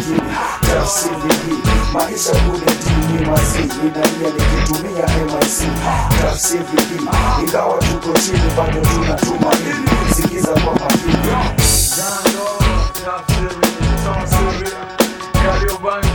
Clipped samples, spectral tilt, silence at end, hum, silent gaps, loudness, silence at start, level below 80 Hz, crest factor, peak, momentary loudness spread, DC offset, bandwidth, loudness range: under 0.1%; -4.5 dB/octave; 0 s; none; none; -16 LUFS; 0 s; -22 dBFS; 16 dB; 0 dBFS; 4 LU; under 0.1%; over 20 kHz; 2 LU